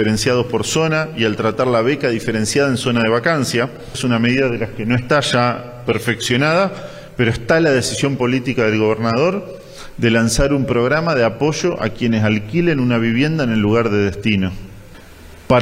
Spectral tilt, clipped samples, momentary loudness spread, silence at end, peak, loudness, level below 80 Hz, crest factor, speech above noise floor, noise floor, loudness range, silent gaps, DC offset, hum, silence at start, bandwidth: -5 dB/octave; under 0.1%; 5 LU; 0 s; -2 dBFS; -17 LUFS; -38 dBFS; 14 dB; 22 dB; -39 dBFS; 1 LU; none; under 0.1%; none; 0 s; 16 kHz